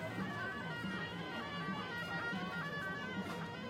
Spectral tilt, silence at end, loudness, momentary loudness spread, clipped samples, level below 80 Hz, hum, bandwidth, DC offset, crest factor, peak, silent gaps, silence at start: -5.5 dB/octave; 0 s; -41 LUFS; 3 LU; under 0.1%; -70 dBFS; none; 16.5 kHz; under 0.1%; 14 dB; -28 dBFS; none; 0 s